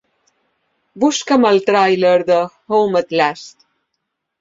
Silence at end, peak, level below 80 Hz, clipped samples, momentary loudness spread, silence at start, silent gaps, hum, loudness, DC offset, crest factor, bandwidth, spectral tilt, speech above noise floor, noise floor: 0.9 s; 0 dBFS; -62 dBFS; under 0.1%; 6 LU; 0.95 s; none; none; -15 LUFS; under 0.1%; 16 dB; 7.8 kHz; -4.5 dB/octave; 60 dB; -75 dBFS